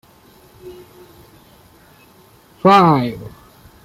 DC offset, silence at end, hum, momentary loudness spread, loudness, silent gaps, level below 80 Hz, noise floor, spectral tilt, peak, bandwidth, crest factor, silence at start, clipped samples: under 0.1%; 0.55 s; none; 28 LU; -13 LUFS; none; -54 dBFS; -48 dBFS; -7 dB/octave; -2 dBFS; 15.5 kHz; 18 dB; 0.65 s; under 0.1%